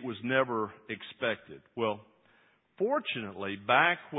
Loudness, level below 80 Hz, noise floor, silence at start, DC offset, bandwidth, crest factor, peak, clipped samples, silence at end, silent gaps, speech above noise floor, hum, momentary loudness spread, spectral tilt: -31 LUFS; -72 dBFS; -66 dBFS; 0 s; under 0.1%; 4 kHz; 24 dB; -8 dBFS; under 0.1%; 0 s; none; 35 dB; none; 16 LU; -8.5 dB/octave